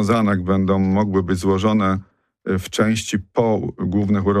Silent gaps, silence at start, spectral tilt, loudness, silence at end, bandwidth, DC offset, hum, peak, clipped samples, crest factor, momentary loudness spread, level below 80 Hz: none; 0 s; -6.5 dB/octave; -19 LUFS; 0 s; 14 kHz; under 0.1%; none; -6 dBFS; under 0.1%; 12 dB; 5 LU; -48 dBFS